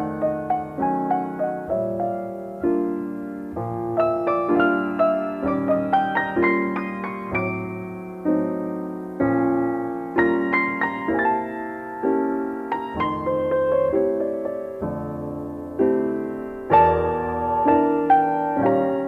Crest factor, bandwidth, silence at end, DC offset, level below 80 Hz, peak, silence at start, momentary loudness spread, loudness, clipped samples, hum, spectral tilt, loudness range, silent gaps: 18 dB; 5.4 kHz; 0 s; under 0.1%; -50 dBFS; -4 dBFS; 0 s; 11 LU; -23 LUFS; under 0.1%; none; -8.5 dB/octave; 4 LU; none